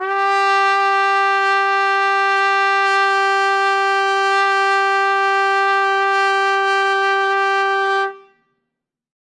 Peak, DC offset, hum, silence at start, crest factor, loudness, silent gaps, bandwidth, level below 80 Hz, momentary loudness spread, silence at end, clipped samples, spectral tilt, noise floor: -4 dBFS; under 0.1%; none; 0 s; 12 dB; -15 LUFS; none; 11 kHz; -86 dBFS; 2 LU; 1.1 s; under 0.1%; 0 dB/octave; -79 dBFS